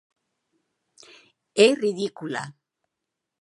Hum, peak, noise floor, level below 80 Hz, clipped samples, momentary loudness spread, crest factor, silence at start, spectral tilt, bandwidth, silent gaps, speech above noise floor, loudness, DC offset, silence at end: none; -4 dBFS; -84 dBFS; -80 dBFS; under 0.1%; 14 LU; 24 dB; 1.55 s; -4 dB/octave; 11.5 kHz; none; 62 dB; -23 LUFS; under 0.1%; 0.9 s